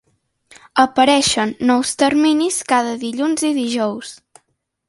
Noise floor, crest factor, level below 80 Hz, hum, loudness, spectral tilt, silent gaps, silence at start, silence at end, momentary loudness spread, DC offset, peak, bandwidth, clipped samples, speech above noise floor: -67 dBFS; 16 dB; -56 dBFS; none; -17 LUFS; -2.5 dB/octave; none; 0.75 s; 0.75 s; 9 LU; under 0.1%; 0 dBFS; 11.5 kHz; under 0.1%; 51 dB